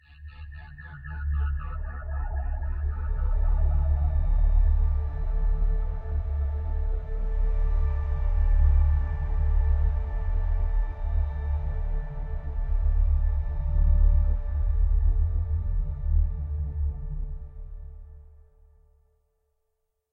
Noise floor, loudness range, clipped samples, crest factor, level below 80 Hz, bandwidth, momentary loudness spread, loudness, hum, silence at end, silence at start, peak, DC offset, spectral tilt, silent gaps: -78 dBFS; 6 LU; under 0.1%; 14 dB; -24 dBFS; 2.5 kHz; 12 LU; -29 LUFS; none; 1.9 s; 0.1 s; -12 dBFS; under 0.1%; -10.5 dB/octave; none